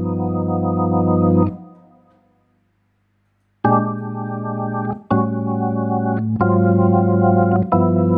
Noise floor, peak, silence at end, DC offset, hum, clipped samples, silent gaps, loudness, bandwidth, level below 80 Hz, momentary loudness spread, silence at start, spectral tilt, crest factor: -64 dBFS; -4 dBFS; 0 s; under 0.1%; 50 Hz at -50 dBFS; under 0.1%; none; -18 LUFS; 3.6 kHz; -52 dBFS; 9 LU; 0 s; -13.5 dB/octave; 14 dB